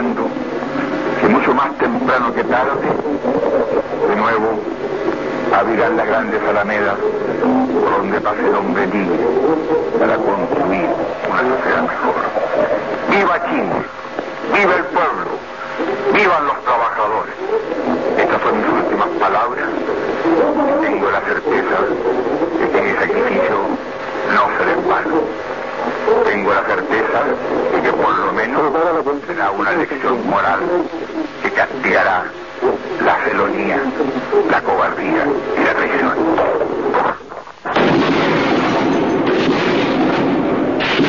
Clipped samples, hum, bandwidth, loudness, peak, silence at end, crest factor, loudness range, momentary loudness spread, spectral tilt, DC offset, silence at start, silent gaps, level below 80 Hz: under 0.1%; none; 7.4 kHz; -16 LUFS; 0 dBFS; 0 s; 16 dB; 1 LU; 6 LU; -6 dB/octave; 0.5%; 0 s; none; -48 dBFS